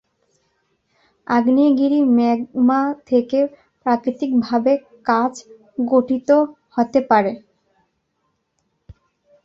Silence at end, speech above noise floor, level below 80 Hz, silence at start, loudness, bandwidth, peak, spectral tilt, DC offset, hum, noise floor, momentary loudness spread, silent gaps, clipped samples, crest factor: 0.55 s; 53 dB; -60 dBFS; 1.3 s; -18 LUFS; 7.4 kHz; -2 dBFS; -6.5 dB/octave; under 0.1%; none; -70 dBFS; 10 LU; none; under 0.1%; 18 dB